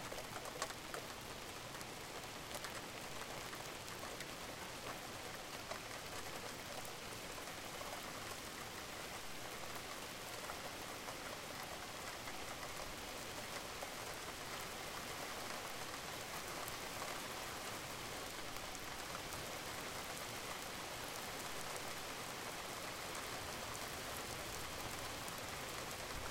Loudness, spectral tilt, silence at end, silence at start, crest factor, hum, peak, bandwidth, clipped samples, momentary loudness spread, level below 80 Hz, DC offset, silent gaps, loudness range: -46 LUFS; -2 dB/octave; 0 s; 0 s; 24 dB; none; -24 dBFS; 17 kHz; under 0.1%; 3 LU; -64 dBFS; under 0.1%; none; 2 LU